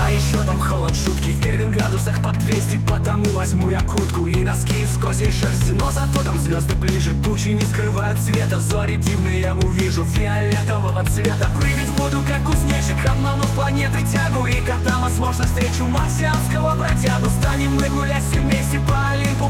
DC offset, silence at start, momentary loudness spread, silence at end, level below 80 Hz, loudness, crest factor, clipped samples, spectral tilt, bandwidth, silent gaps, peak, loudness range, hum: under 0.1%; 0 s; 1 LU; 0 s; -26 dBFS; -19 LUFS; 12 dB; under 0.1%; -5.5 dB/octave; 17 kHz; none; -6 dBFS; 1 LU; none